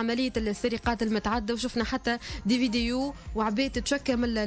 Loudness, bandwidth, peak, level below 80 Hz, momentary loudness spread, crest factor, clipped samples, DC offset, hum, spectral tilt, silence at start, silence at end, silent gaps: -28 LUFS; 8 kHz; -14 dBFS; -42 dBFS; 4 LU; 14 dB; under 0.1%; under 0.1%; none; -4.5 dB/octave; 0 s; 0 s; none